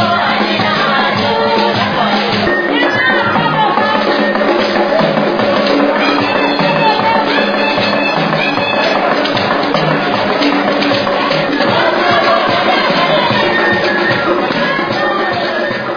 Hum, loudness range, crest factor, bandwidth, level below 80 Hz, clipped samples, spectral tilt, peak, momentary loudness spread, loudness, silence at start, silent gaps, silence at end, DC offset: none; 1 LU; 12 dB; 5.4 kHz; -48 dBFS; under 0.1%; -5.5 dB/octave; 0 dBFS; 2 LU; -12 LUFS; 0 s; none; 0 s; under 0.1%